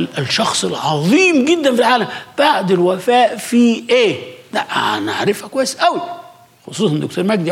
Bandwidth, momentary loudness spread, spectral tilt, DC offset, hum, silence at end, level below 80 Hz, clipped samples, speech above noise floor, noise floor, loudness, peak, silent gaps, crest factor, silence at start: 16 kHz; 10 LU; -4.5 dB/octave; under 0.1%; none; 0 s; -66 dBFS; under 0.1%; 25 dB; -40 dBFS; -15 LUFS; -2 dBFS; none; 12 dB; 0 s